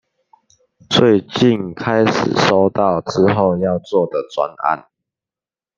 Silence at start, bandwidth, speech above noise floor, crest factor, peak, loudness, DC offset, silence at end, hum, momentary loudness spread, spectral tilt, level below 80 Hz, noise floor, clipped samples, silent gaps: 0.9 s; 7.6 kHz; over 74 dB; 16 dB; 0 dBFS; -16 LUFS; under 0.1%; 0.95 s; none; 7 LU; -6 dB/octave; -54 dBFS; under -90 dBFS; under 0.1%; none